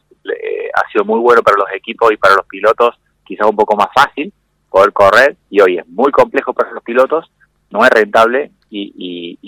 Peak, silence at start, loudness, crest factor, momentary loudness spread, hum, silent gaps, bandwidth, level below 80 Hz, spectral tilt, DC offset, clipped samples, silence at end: 0 dBFS; 0.25 s; -12 LUFS; 12 dB; 16 LU; none; none; 18.5 kHz; -52 dBFS; -4.5 dB/octave; under 0.1%; 2%; 0 s